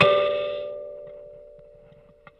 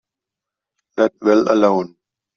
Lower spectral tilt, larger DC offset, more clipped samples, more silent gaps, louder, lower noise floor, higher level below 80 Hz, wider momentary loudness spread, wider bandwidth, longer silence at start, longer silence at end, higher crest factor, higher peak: about the same, -5.5 dB/octave vs -6.5 dB/octave; neither; neither; neither; second, -25 LUFS vs -16 LUFS; second, -52 dBFS vs -85 dBFS; about the same, -60 dBFS vs -62 dBFS; first, 25 LU vs 15 LU; second, 5.8 kHz vs 7 kHz; second, 0 s vs 0.95 s; first, 0.85 s vs 0.5 s; first, 24 dB vs 16 dB; about the same, -2 dBFS vs -2 dBFS